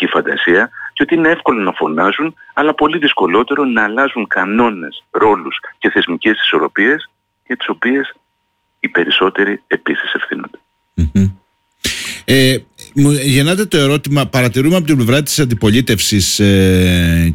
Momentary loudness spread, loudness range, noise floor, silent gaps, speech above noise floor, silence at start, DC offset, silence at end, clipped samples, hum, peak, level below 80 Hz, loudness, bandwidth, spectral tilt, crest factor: 9 LU; 4 LU; -65 dBFS; none; 52 dB; 0 s; under 0.1%; 0 s; under 0.1%; none; -2 dBFS; -34 dBFS; -13 LUFS; 17 kHz; -4.5 dB/octave; 12 dB